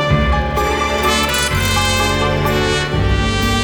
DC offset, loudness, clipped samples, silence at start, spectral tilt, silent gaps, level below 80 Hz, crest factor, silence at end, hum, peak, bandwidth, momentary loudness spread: under 0.1%; -15 LUFS; under 0.1%; 0 s; -4 dB/octave; none; -24 dBFS; 14 dB; 0 s; none; -2 dBFS; over 20 kHz; 2 LU